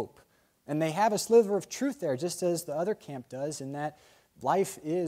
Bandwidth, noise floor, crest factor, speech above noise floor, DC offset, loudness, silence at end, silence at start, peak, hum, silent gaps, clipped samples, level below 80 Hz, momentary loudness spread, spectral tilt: 16 kHz; -64 dBFS; 18 dB; 35 dB; under 0.1%; -30 LUFS; 0 s; 0 s; -12 dBFS; none; none; under 0.1%; -74 dBFS; 13 LU; -5 dB/octave